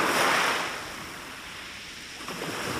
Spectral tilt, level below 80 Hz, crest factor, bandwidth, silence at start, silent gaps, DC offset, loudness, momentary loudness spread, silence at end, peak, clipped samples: -2 dB/octave; -60 dBFS; 18 dB; 16 kHz; 0 s; none; under 0.1%; -29 LUFS; 16 LU; 0 s; -12 dBFS; under 0.1%